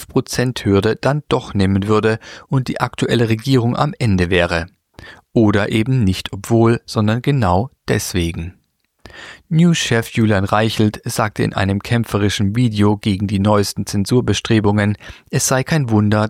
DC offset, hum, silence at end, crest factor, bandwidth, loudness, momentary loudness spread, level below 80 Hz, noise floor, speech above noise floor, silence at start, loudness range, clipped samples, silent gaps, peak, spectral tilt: under 0.1%; none; 0 s; 16 dB; 15.5 kHz; -17 LUFS; 6 LU; -42 dBFS; -46 dBFS; 30 dB; 0 s; 2 LU; under 0.1%; none; -2 dBFS; -5.5 dB/octave